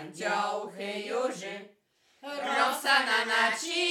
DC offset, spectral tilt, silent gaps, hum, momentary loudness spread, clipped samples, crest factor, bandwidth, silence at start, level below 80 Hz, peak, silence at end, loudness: under 0.1%; -1.5 dB/octave; none; none; 16 LU; under 0.1%; 20 dB; 19 kHz; 0 s; under -90 dBFS; -10 dBFS; 0 s; -28 LUFS